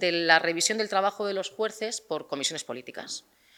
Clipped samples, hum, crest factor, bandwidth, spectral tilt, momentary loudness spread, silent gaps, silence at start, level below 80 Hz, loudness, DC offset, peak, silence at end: under 0.1%; none; 26 dB; 20 kHz; -1.5 dB/octave; 16 LU; none; 0 s; -80 dBFS; -27 LUFS; under 0.1%; -2 dBFS; 0.4 s